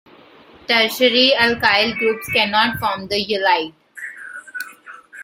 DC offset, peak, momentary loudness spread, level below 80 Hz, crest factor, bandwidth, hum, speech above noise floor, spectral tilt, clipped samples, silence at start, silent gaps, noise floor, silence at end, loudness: under 0.1%; 0 dBFS; 19 LU; -54 dBFS; 18 dB; 16.5 kHz; none; 29 dB; -3 dB/octave; under 0.1%; 0.7 s; none; -46 dBFS; 0 s; -16 LUFS